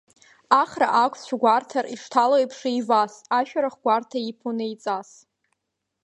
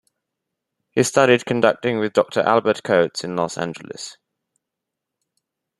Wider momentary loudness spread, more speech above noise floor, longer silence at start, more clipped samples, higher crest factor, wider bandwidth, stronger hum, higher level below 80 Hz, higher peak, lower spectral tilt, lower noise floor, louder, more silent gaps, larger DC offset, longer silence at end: second, 10 LU vs 15 LU; second, 58 dB vs 64 dB; second, 0.5 s vs 0.95 s; neither; about the same, 22 dB vs 20 dB; second, 10.5 kHz vs 12.5 kHz; neither; second, -76 dBFS vs -64 dBFS; about the same, -2 dBFS vs -2 dBFS; about the same, -4 dB/octave vs -4.5 dB/octave; about the same, -80 dBFS vs -83 dBFS; second, -23 LUFS vs -19 LUFS; neither; neither; second, 1 s vs 1.65 s